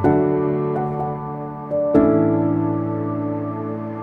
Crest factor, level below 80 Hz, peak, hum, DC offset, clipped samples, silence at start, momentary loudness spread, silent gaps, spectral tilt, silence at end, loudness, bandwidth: 18 dB; -48 dBFS; -2 dBFS; none; under 0.1%; under 0.1%; 0 s; 11 LU; none; -11.5 dB/octave; 0 s; -21 LUFS; 3.9 kHz